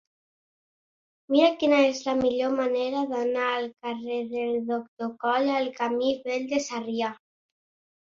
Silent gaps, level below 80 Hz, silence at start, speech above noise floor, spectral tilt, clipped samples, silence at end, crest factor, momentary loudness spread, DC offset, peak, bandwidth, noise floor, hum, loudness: 4.88-4.97 s; -68 dBFS; 1.3 s; over 64 dB; -3.5 dB/octave; under 0.1%; 0.85 s; 18 dB; 10 LU; under 0.1%; -8 dBFS; 7.6 kHz; under -90 dBFS; none; -26 LUFS